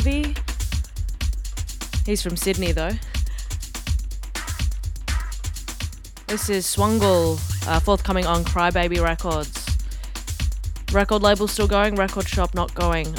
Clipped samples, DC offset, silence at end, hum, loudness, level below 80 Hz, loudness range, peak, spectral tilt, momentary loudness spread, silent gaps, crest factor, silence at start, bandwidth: under 0.1%; under 0.1%; 0 s; none; -23 LUFS; -26 dBFS; 6 LU; -2 dBFS; -4.5 dB/octave; 12 LU; none; 20 dB; 0 s; 19 kHz